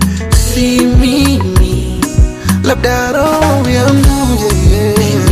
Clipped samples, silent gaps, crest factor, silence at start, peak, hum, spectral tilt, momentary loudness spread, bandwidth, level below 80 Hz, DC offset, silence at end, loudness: under 0.1%; none; 10 dB; 0 s; 0 dBFS; none; -5.5 dB/octave; 3 LU; 15.5 kHz; -16 dBFS; under 0.1%; 0 s; -11 LUFS